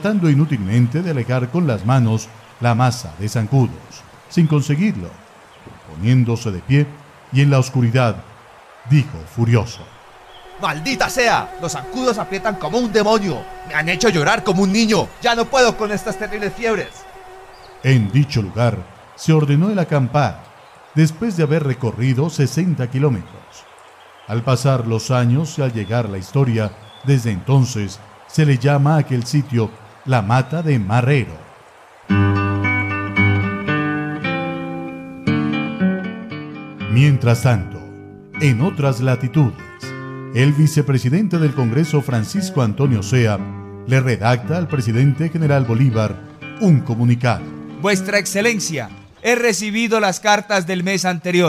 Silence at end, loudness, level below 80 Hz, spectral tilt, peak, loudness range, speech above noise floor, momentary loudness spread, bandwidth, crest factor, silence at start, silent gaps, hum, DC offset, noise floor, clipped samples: 0 s; -18 LUFS; -44 dBFS; -6 dB/octave; -2 dBFS; 3 LU; 28 dB; 11 LU; 14.5 kHz; 16 dB; 0 s; none; none; under 0.1%; -45 dBFS; under 0.1%